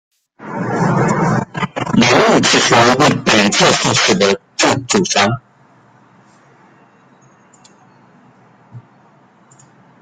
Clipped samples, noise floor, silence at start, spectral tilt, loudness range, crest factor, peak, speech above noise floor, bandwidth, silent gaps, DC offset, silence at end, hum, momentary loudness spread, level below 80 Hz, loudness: under 0.1%; -49 dBFS; 0.4 s; -3.5 dB/octave; 9 LU; 16 dB; 0 dBFS; 37 dB; 15 kHz; none; under 0.1%; 1.25 s; none; 11 LU; -50 dBFS; -13 LUFS